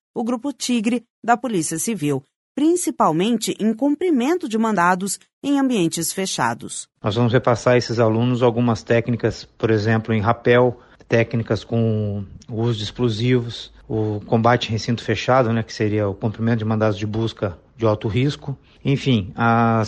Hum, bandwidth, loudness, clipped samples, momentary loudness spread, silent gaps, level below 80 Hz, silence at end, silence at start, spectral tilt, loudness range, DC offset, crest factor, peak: none; 11.5 kHz; -20 LUFS; under 0.1%; 8 LU; 1.10-1.22 s, 2.36-2.55 s, 5.33-5.42 s; -50 dBFS; 0 s; 0.15 s; -5.5 dB/octave; 3 LU; under 0.1%; 18 dB; -2 dBFS